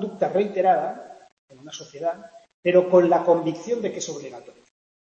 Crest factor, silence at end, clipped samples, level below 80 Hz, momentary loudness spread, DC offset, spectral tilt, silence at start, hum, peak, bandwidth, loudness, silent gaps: 18 dB; 0.6 s; under 0.1%; -74 dBFS; 21 LU; under 0.1%; -5.5 dB/octave; 0 s; none; -4 dBFS; 7.8 kHz; -22 LUFS; 1.32-1.48 s, 2.54-2.63 s